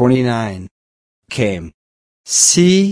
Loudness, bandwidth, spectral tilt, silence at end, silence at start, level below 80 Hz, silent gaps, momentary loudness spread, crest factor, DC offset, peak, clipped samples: -13 LUFS; 11 kHz; -4 dB/octave; 0 s; 0 s; -48 dBFS; 0.71-1.22 s, 1.74-2.24 s; 18 LU; 16 dB; under 0.1%; 0 dBFS; under 0.1%